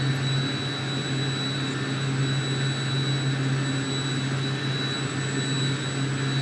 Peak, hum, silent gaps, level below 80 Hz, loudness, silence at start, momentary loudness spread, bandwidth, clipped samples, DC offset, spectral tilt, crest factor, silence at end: -14 dBFS; none; none; -60 dBFS; -26 LUFS; 0 s; 2 LU; 11 kHz; under 0.1%; under 0.1%; -5 dB/octave; 12 dB; 0 s